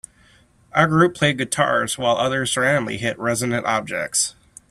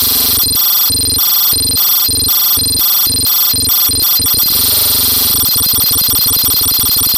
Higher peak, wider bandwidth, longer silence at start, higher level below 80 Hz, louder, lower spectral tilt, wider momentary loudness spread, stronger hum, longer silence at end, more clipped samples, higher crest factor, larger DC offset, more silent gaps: about the same, -2 dBFS vs 0 dBFS; second, 14 kHz vs 17 kHz; first, 0.75 s vs 0 s; second, -54 dBFS vs -34 dBFS; second, -20 LUFS vs -8 LUFS; first, -3.5 dB/octave vs -0.5 dB/octave; first, 7 LU vs 1 LU; neither; first, 0.4 s vs 0 s; neither; first, 20 dB vs 10 dB; neither; neither